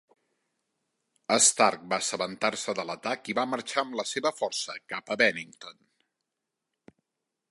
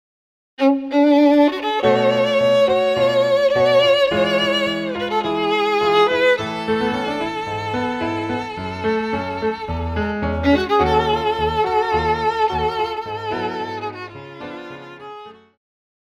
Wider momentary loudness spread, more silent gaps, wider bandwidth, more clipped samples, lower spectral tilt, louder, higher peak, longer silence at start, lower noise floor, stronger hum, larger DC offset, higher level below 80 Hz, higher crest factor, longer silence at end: first, 17 LU vs 13 LU; neither; second, 11.5 kHz vs 14 kHz; neither; second, -1 dB/octave vs -5.5 dB/octave; second, -27 LUFS vs -18 LUFS; second, -8 dBFS vs -2 dBFS; first, 1.3 s vs 0.6 s; first, -85 dBFS vs -38 dBFS; neither; neither; second, -78 dBFS vs -40 dBFS; first, 24 dB vs 16 dB; first, 1.8 s vs 0.7 s